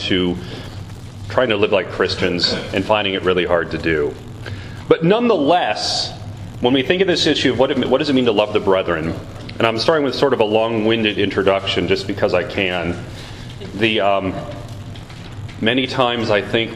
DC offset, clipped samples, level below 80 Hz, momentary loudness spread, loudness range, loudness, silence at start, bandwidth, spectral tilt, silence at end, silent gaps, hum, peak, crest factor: under 0.1%; under 0.1%; -42 dBFS; 17 LU; 4 LU; -17 LUFS; 0 s; 12.5 kHz; -5 dB/octave; 0 s; none; none; 0 dBFS; 18 dB